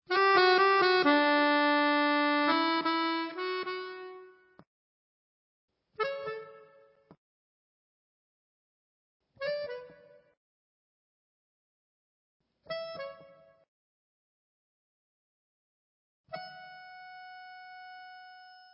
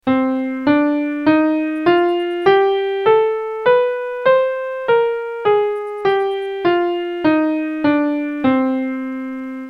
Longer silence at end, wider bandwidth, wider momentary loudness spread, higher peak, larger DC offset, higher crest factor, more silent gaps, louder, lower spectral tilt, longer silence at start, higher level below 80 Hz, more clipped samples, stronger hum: first, 0.3 s vs 0 s; about the same, 5.8 kHz vs 5.6 kHz; first, 25 LU vs 6 LU; second, -12 dBFS vs 0 dBFS; neither; first, 22 dB vs 16 dB; first, 4.67-5.68 s, 7.18-9.20 s, 10.37-12.40 s, 13.68-16.24 s vs none; second, -27 LUFS vs -17 LUFS; about the same, -6.5 dB/octave vs -7 dB/octave; about the same, 0.1 s vs 0.05 s; second, -84 dBFS vs -58 dBFS; neither; neither